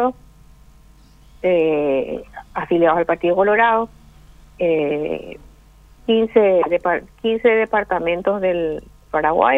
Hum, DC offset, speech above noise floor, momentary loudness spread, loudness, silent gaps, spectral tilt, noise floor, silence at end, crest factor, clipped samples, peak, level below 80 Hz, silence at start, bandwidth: none; under 0.1%; 30 dB; 14 LU; -18 LUFS; none; -7 dB/octave; -47 dBFS; 0 s; 18 dB; under 0.1%; 0 dBFS; -48 dBFS; 0 s; 4.1 kHz